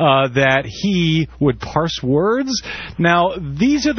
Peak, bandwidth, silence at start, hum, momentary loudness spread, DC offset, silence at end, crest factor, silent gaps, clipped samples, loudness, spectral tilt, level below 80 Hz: 0 dBFS; 6.6 kHz; 0 s; none; 6 LU; under 0.1%; 0 s; 16 dB; none; under 0.1%; -17 LUFS; -5.5 dB/octave; -40 dBFS